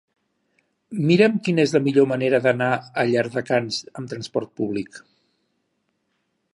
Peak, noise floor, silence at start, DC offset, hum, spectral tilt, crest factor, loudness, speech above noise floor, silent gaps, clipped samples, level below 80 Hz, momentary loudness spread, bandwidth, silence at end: -2 dBFS; -73 dBFS; 0.9 s; under 0.1%; none; -6 dB/octave; 20 dB; -21 LUFS; 52 dB; none; under 0.1%; -66 dBFS; 13 LU; 11.5 kHz; 1.55 s